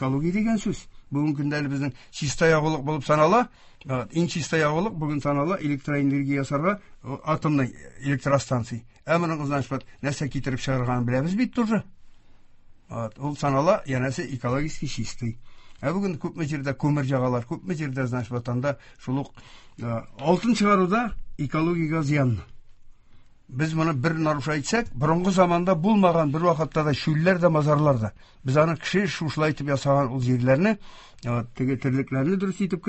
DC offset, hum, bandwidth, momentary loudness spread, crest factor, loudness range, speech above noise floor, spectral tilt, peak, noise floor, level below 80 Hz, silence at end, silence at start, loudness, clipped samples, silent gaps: under 0.1%; none; 8.4 kHz; 11 LU; 20 dB; 6 LU; 25 dB; -6.5 dB/octave; -4 dBFS; -49 dBFS; -50 dBFS; 0 s; 0 s; -25 LUFS; under 0.1%; none